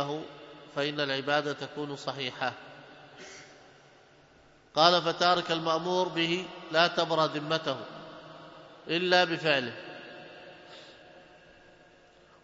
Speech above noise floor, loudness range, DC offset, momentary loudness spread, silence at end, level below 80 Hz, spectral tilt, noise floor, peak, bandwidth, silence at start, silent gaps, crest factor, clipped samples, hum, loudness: 31 dB; 8 LU; under 0.1%; 24 LU; 1.25 s; -74 dBFS; -4 dB/octave; -59 dBFS; -6 dBFS; 7.8 kHz; 0 s; none; 26 dB; under 0.1%; none; -28 LUFS